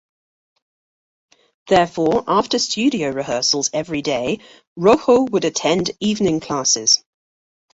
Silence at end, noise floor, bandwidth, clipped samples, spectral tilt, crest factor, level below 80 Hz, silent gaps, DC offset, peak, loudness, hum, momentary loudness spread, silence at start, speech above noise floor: 0.75 s; under -90 dBFS; 8 kHz; under 0.1%; -3 dB/octave; 18 dB; -54 dBFS; 4.67-4.76 s; under 0.1%; 0 dBFS; -18 LUFS; none; 7 LU; 1.65 s; over 72 dB